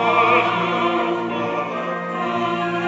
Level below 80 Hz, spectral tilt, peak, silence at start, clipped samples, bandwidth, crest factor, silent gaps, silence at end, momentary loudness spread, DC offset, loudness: -62 dBFS; -6 dB/octave; -2 dBFS; 0 s; under 0.1%; 8 kHz; 18 dB; none; 0 s; 9 LU; under 0.1%; -20 LUFS